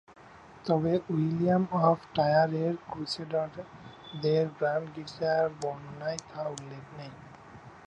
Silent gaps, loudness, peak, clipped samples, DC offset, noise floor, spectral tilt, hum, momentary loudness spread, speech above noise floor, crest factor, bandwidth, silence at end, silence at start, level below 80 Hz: none; -29 LUFS; -12 dBFS; under 0.1%; under 0.1%; -52 dBFS; -6.5 dB/octave; none; 19 LU; 22 dB; 20 dB; 10 kHz; 0 s; 0.1 s; -64 dBFS